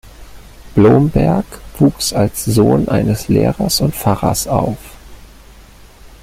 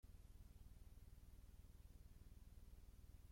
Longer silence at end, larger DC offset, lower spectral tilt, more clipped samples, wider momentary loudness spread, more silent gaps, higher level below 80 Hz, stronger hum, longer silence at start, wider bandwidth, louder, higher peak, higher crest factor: first, 0.15 s vs 0 s; neither; about the same, -6 dB/octave vs -5.5 dB/octave; neither; first, 8 LU vs 1 LU; neither; first, -34 dBFS vs -64 dBFS; neither; about the same, 0.05 s vs 0.05 s; about the same, 16.5 kHz vs 16.5 kHz; first, -14 LUFS vs -67 LUFS; first, 0 dBFS vs -52 dBFS; about the same, 14 dB vs 10 dB